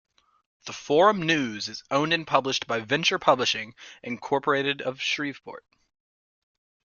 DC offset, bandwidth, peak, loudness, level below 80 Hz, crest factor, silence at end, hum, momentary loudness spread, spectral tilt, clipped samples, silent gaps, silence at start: under 0.1%; 7.4 kHz; -4 dBFS; -24 LUFS; -68 dBFS; 22 dB; 1.4 s; none; 18 LU; -3.5 dB/octave; under 0.1%; none; 0.65 s